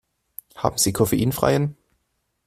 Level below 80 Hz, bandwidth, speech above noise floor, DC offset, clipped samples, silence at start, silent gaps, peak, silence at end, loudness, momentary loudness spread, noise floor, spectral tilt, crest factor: -48 dBFS; 16 kHz; 53 dB; under 0.1%; under 0.1%; 0.55 s; none; -2 dBFS; 0.75 s; -21 LUFS; 21 LU; -73 dBFS; -4.5 dB/octave; 22 dB